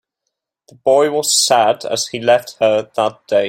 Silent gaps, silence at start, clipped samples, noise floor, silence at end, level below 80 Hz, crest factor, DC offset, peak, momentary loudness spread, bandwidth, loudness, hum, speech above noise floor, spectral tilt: none; 0.85 s; under 0.1%; -77 dBFS; 0 s; -62 dBFS; 14 dB; under 0.1%; -2 dBFS; 8 LU; 16.5 kHz; -15 LUFS; none; 62 dB; -2 dB/octave